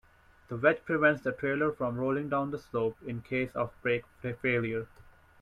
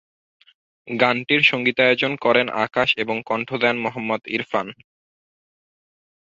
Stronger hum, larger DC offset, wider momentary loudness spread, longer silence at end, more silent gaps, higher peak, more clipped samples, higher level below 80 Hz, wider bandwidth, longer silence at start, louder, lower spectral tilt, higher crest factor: neither; neither; about the same, 10 LU vs 10 LU; second, 0.55 s vs 1.55 s; neither; second, -10 dBFS vs -2 dBFS; neither; about the same, -60 dBFS vs -64 dBFS; first, 12 kHz vs 7.6 kHz; second, 0.5 s vs 0.85 s; second, -31 LUFS vs -20 LUFS; first, -8 dB/octave vs -5.5 dB/octave; about the same, 20 dB vs 20 dB